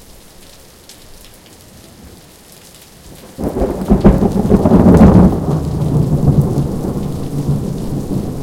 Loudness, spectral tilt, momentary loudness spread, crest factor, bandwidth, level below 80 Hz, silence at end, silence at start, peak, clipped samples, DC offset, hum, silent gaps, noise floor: -13 LUFS; -9 dB/octave; 14 LU; 14 dB; 16.5 kHz; -24 dBFS; 0 s; 0.9 s; 0 dBFS; 0.2%; under 0.1%; none; none; -40 dBFS